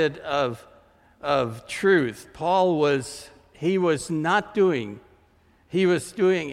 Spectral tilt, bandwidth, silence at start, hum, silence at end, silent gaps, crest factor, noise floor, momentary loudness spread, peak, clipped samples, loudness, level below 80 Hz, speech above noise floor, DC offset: -5.5 dB/octave; 14 kHz; 0 s; none; 0 s; none; 16 dB; -59 dBFS; 12 LU; -8 dBFS; under 0.1%; -24 LUFS; -60 dBFS; 36 dB; under 0.1%